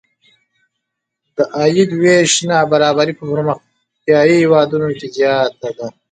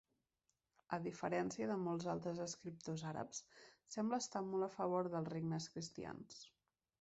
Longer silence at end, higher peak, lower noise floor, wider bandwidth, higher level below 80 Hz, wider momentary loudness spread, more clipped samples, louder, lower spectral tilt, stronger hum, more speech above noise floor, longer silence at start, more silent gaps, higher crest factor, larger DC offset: second, 0.2 s vs 0.55 s; first, 0 dBFS vs -26 dBFS; second, -76 dBFS vs -88 dBFS; first, 9.4 kHz vs 8 kHz; first, -58 dBFS vs -78 dBFS; first, 15 LU vs 11 LU; neither; first, -13 LUFS vs -44 LUFS; about the same, -4.5 dB/octave vs -5.5 dB/octave; neither; first, 63 dB vs 44 dB; first, 1.4 s vs 0.9 s; neither; about the same, 14 dB vs 18 dB; neither